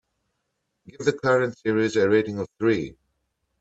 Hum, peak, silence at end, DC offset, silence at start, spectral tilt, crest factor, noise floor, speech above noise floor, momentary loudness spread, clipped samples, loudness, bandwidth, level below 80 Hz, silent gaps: none; -6 dBFS; 0.7 s; under 0.1%; 1 s; -6 dB/octave; 18 dB; -77 dBFS; 55 dB; 7 LU; under 0.1%; -23 LUFS; 8 kHz; -62 dBFS; none